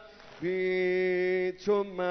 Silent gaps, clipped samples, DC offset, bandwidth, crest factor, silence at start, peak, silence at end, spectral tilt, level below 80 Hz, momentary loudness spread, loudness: none; under 0.1%; under 0.1%; 6.4 kHz; 14 dB; 0 s; -16 dBFS; 0 s; -7 dB/octave; -66 dBFS; 5 LU; -29 LUFS